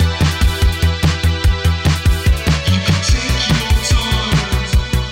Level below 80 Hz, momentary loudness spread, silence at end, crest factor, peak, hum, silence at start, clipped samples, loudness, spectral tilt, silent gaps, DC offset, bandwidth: -18 dBFS; 2 LU; 0 s; 10 dB; -4 dBFS; none; 0 s; under 0.1%; -15 LUFS; -4.5 dB/octave; none; under 0.1%; 16.5 kHz